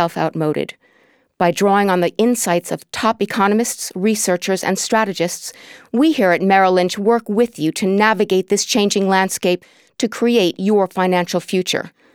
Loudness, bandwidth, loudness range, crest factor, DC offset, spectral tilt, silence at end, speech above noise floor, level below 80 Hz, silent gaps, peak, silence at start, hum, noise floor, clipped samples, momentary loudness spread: -17 LUFS; 19 kHz; 3 LU; 16 dB; under 0.1%; -4 dB/octave; 0.25 s; 40 dB; -64 dBFS; none; 0 dBFS; 0 s; none; -56 dBFS; under 0.1%; 7 LU